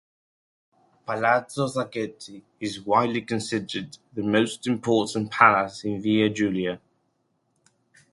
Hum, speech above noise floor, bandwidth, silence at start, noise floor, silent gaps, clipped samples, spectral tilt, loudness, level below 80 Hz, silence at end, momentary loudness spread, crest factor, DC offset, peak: none; 47 dB; 11.5 kHz; 1.1 s; -72 dBFS; none; under 0.1%; -5 dB/octave; -24 LUFS; -62 dBFS; 1.35 s; 16 LU; 26 dB; under 0.1%; 0 dBFS